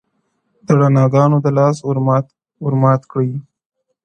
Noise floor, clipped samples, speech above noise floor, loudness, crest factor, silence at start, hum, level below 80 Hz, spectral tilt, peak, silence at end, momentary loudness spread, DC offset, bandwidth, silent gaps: -67 dBFS; under 0.1%; 53 dB; -15 LUFS; 16 dB; 0.7 s; none; -58 dBFS; -9 dB/octave; 0 dBFS; 0.65 s; 10 LU; under 0.1%; 8.8 kHz; none